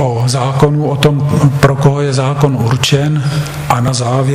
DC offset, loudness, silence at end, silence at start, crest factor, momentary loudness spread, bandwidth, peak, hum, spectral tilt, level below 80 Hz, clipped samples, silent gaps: under 0.1%; -12 LUFS; 0 s; 0 s; 12 dB; 4 LU; 15 kHz; 0 dBFS; none; -6 dB/octave; -36 dBFS; 0.3%; none